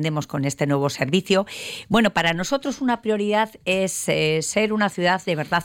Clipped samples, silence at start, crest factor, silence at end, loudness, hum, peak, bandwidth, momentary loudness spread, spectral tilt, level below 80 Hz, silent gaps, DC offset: under 0.1%; 0 s; 16 dB; 0 s; -22 LUFS; none; -6 dBFS; 17 kHz; 5 LU; -4.5 dB/octave; -54 dBFS; none; under 0.1%